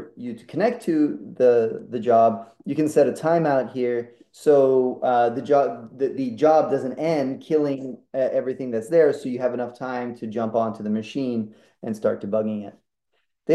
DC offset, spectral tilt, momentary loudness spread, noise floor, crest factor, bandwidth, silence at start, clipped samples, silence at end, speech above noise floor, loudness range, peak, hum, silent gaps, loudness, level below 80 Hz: under 0.1%; -7 dB/octave; 12 LU; -74 dBFS; 16 dB; 12.5 kHz; 0 s; under 0.1%; 0 s; 53 dB; 6 LU; -6 dBFS; none; none; -22 LUFS; -74 dBFS